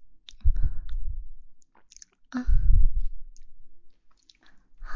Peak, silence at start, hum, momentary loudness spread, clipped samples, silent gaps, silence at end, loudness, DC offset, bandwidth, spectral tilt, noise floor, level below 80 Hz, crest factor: -6 dBFS; 0 s; none; 25 LU; under 0.1%; none; 0 s; -31 LUFS; under 0.1%; 6.8 kHz; -6.5 dB/octave; -56 dBFS; -28 dBFS; 16 dB